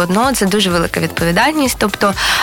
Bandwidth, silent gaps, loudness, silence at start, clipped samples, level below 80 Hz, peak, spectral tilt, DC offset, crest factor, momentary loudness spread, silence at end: 18.5 kHz; none; -14 LUFS; 0 s; under 0.1%; -34 dBFS; -2 dBFS; -4 dB/octave; under 0.1%; 14 dB; 3 LU; 0 s